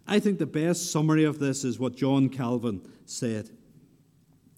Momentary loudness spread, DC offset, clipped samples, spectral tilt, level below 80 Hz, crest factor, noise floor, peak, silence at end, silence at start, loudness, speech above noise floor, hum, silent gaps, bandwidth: 12 LU; under 0.1%; under 0.1%; -5.5 dB/octave; -70 dBFS; 16 dB; -61 dBFS; -10 dBFS; 1.1 s; 0.05 s; -27 LUFS; 35 dB; none; none; 16 kHz